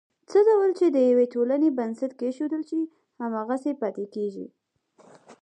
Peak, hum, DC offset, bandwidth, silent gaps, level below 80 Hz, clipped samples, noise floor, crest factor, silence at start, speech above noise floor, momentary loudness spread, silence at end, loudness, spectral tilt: -10 dBFS; none; under 0.1%; 9.4 kHz; none; -84 dBFS; under 0.1%; -59 dBFS; 14 dB; 0.3 s; 35 dB; 13 LU; 0.1 s; -25 LUFS; -7 dB/octave